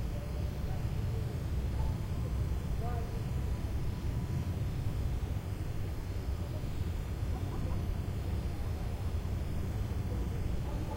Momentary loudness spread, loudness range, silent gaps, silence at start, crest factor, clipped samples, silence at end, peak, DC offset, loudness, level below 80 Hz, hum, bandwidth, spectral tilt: 2 LU; 1 LU; none; 0 s; 12 dB; under 0.1%; 0 s; -22 dBFS; under 0.1%; -37 LUFS; -38 dBFS; none; 16 kHz; -7 dB/octave